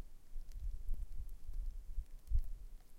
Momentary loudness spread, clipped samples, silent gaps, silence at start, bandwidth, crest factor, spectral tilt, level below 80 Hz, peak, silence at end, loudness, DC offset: 12 LU; under 0.1%; none; 0 s; 1.4 kHz; 16 dB; -6.5 dB/octave; -42 dBFS; -24 dBFS; 0 s; -49 LUFS; under 0.1%